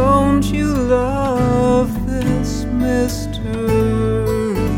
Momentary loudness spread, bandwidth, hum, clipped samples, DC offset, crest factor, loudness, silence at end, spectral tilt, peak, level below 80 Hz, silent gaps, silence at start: 6 LU; 17 kHz; none; under 0.1%; under 0.1%; 14 dB; -17 LUFS; 0 s; -7 dB/octave; -2 dBFS; -26 dBFS; none; 0 s